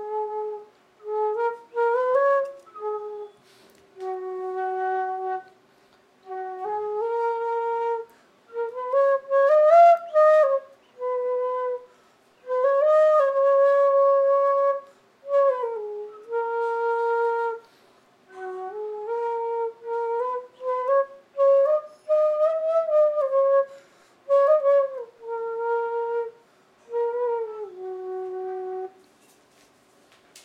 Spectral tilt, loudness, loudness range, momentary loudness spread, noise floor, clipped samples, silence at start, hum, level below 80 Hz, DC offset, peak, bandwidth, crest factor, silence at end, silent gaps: -4 dB/octave; -23 LUFS; 11 LU; 16 LU; -59 dBFS; under 0.1%; 0 s; none; -86 dBFS; under 0.1%; -6 dBFS; 7.6 kHz; 18 dB; 0.05 s; none